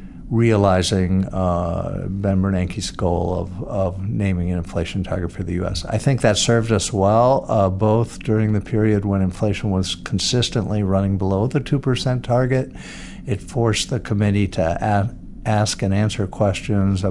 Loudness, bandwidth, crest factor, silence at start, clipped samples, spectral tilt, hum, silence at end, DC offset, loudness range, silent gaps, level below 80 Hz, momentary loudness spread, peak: -20 LUFS; 11.5 kHz; 18 dB; 0 s; under 0.1%; -6 dB/octave; none; 0 s; under 0.1%; 4 LU; none; -38 dBFS; 8 LU; -2 dBFS